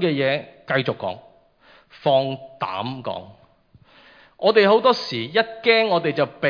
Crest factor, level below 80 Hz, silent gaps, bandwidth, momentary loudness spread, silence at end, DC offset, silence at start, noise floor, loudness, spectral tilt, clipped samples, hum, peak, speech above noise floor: 18 dB; -66 dBFS; none; 5.2 kHz; 14 LU; 0 s; under 0.1%; 0 s; -55 dBFS; -21 LUFS; -6 dB/octave; under 0.1%; none; -4 dBFS; 34 dB